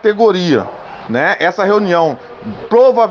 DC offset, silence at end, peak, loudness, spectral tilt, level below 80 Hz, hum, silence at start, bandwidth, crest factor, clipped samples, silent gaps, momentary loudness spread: under 0.1%; 0 s; 0 dBFS; -12 LUFS; -6 dB/octave; -56 dBFS; none; 0.05 s; 7 kHz; 12 dB; under 0.1%; none; 17 LU